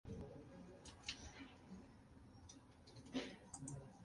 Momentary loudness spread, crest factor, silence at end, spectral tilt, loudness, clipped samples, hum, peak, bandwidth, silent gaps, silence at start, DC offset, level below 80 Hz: 14 LU; 24 dB; 0 s; -4 dB/octave; -55 LUFS; under 0.1%; none; -32 dBFS; 11.5 kHz; none; 0.05 s; under 0.1%; -68 dBFS